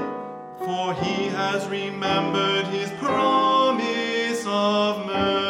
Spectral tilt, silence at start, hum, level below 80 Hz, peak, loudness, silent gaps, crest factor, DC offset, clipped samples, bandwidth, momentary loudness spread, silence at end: -4.5 dB/octave; 0 s; none; -58 dBFS; -8 dBFS; -23 LUFS; none; 14 dB; under 0.1%; under 0.1%; 16.5 kHz; 9 LU; 0 s